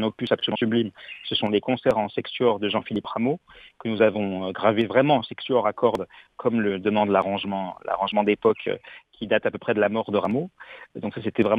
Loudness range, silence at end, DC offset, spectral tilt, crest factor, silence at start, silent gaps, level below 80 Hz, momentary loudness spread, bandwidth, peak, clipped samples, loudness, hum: 2 LU; 0 s; under 0.1%; -7.5 dB/octave; 18 dB; 0 s; none; -62 dBFS; 11 LU; 8.2 kHz; -6 dBFS; under 0.1%; -24 LUFS; none